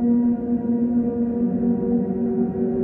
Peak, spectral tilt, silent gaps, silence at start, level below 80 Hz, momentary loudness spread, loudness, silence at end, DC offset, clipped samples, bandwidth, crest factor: -10 dBFS; -13.5 dB/octave; none; 0 s; -48 dBFS; 2 LU; -22 LUFS; 0 s; under 0.1%; under 0.1%; 2 kHz; 10 dB